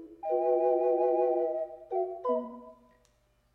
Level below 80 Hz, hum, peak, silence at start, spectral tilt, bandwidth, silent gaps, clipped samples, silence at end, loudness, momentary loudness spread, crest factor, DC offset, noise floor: -72 dBFS; none; -16 dBFS; 0 s; -8 dB/octave; 3.2 kHz; none; under 0.1%; 0.8 s; -29 LUFS; 9 LU; 14 dB; under 0.1%; -69 dBFS